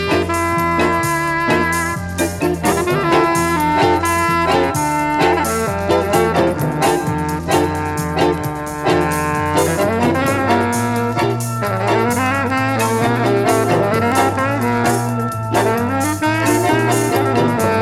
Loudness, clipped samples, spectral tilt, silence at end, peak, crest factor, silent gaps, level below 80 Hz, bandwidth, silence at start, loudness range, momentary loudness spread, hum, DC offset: -16 LUFS; under 0.1%; -5 dB/octave; 0 s; 0 dBFS; 16 dB; none; -40 dBFS; 17 kHz; 0 s; 2 LU; 4 LU; none; under 0.1%